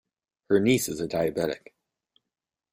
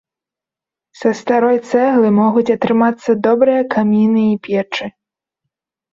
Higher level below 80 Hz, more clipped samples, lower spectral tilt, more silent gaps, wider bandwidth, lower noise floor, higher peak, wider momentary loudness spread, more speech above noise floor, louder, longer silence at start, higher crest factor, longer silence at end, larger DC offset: about the same, -60 dBFS vs -60 dBFS; neither; second, -5 dB/octave vs -7 dB/octave; neither; first, 16 kHz vs 7.6 kHz; about the same, -88 dBFS vs -87 dBFS; second, -8 dBFS vs -2 dBFS; about the same, 9 LU vs 7 LU; second, 63 dB vs 74 dB; second, -26 LUFS vs -14 LUFS; second, 0.5 s vs 1 s; first, 20 dB vs 14 dB; about the same, 1.15 s vs 1.05 s; neither